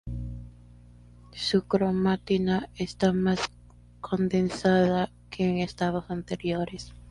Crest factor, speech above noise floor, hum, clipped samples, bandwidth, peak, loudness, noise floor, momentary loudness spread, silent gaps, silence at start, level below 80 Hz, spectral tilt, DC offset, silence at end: 18 dB; 25 dB; 60 Hz at -45 dBFS; under 0.1%; 11 kHz; -10 dBFS; -27 LUFS; -51 dBFS; 13 LU; none; 0.05 s; -48 dBFS; -6.5 dB/octave; under 0.1%; 0 s